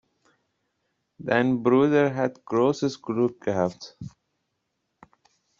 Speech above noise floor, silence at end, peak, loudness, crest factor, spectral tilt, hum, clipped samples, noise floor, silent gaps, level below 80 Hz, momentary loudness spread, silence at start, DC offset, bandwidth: 54 dB; 1.5 s; -6 dBFS; -24 LUFS; 20 dB; -6 dB/octave; none; under 0.1%; -78 dBFS; none; -66 dBFS; 20 LU; 1.2 s; under 0.1%; 7.6 kHz